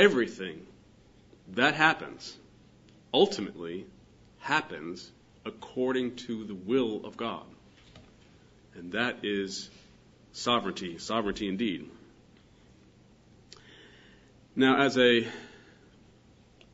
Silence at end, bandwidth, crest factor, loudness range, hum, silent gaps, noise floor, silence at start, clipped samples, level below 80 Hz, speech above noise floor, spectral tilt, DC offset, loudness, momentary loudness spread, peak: 1.15 s; 8 kHz; 26 dB; 7 LU; none; none; -59 dBFS; 0 s; under 0.1%; -64 dBFS; 30 dB; -4.5 dB/octave; under 0.1%; -29 LUFS; 21 LU; -6 dBFS